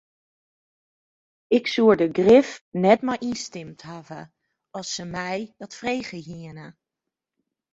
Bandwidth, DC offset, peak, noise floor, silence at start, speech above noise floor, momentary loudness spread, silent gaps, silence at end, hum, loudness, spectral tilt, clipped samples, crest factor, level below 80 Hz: 8 kHz; under 0.1%; -2 dBFS; -86 dBFS; 1.5 s; 63 dB; 22 LU; 2.61-2.72 s; 1 s; none; -22 LUFS; -5 dB/octave; under 0.1%; 22 dB; -62 dBFS